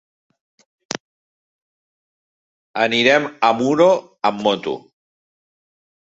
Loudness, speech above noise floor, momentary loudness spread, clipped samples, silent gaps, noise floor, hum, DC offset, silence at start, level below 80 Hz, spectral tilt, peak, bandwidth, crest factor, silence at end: -17 LUFS; over 73 dB; 16 LU; under 0.1%; 1.00-2.74 s; under -90 dBFS; none; under 0.1%; 0.9 s; -66 dBFS; -4 dB/octave; 0 dBFS; 8 kHz; 22 dB; 1.35 s